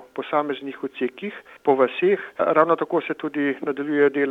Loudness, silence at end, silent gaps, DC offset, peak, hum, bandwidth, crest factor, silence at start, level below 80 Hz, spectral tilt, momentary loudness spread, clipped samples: -22 LUFS; 0 s; none; under 0.1%; -2 dBFS; none; 4.6 kHz; 20 dB; 0 s; -74 dBFS; -7.5 dB/octave; 10 LU; under 0.1%